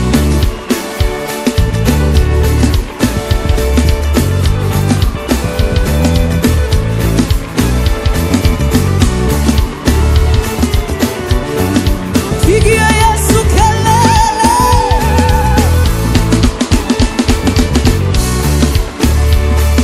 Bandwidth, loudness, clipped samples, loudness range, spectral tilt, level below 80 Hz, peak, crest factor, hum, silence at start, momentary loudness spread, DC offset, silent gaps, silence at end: 16 kHz; -12 LUFS; 0.3%; 3 LU; -5.5 dB/octave; -14 dBFS; 0 dBFS; 10 dB; none; 0 s; 5 LU; under 0.1%; none; 0 s